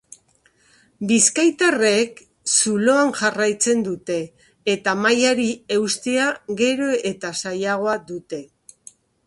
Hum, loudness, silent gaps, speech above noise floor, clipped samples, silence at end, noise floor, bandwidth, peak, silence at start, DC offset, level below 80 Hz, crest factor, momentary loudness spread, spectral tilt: none; -19 LUFS; none; 40 dB; under 0.1%; 0.85 s; -60 dBFS; 11.5 kHz; 0 dBFS; 1 s; under 0.1%; -64 dBFS; 20 dB; 11 LU; -2.5 dB/octave